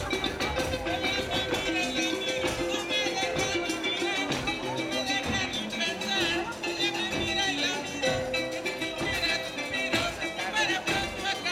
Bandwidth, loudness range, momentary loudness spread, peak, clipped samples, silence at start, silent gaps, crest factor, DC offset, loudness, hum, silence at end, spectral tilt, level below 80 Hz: 17 kHz; 1 LU; 4 LU; -12 dBFS; under 0.1%; 0 s; none; 16 dB; under 0.1%; -28 LUFS; none; 0 s; -3 dB/octave; -50 dBFS